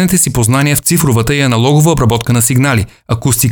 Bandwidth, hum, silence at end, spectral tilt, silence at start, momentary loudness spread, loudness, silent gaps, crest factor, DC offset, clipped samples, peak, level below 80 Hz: over 20 kHz; none; 0 s; -4.5 dB/octave; 0 s; 4 LU; -11 LUFS; none; 10 dB; under 0.1%; under 0.1%; 0 dBFS; -32 dBFS